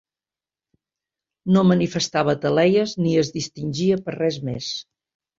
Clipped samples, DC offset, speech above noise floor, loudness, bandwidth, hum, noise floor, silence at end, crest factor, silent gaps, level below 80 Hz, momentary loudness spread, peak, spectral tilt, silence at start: under 0.1%; under 0.1%; over 70 dB; -21 LUFS; 7.6 kHz; none; under -90 dBFS; 0.55 s; 18 dB; none; -58 dBFS; 11 LU; -4 dBFS; -6 dB/octave; 1.45 s